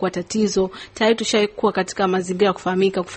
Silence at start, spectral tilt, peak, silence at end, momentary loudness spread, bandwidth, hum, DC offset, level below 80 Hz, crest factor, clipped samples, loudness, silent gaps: 0 s; -4.5 dB/octave; -4 dBFS; 0 s; 4 LU; 8.8 kHz; none; under 0.1%; -52 dBFS; 16 dB; under 0.1%; -20 LUFS; none